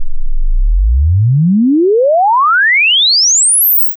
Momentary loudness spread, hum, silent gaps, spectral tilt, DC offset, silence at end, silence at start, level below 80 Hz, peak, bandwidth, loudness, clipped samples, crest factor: 12 LU; none; none; -3 dB/octave; under 0.1%; 0.05 s; 0 s; -16 dBFS; -6 dBFS; 7 kHz; -8 LUFS; under 0.1%; 4 dB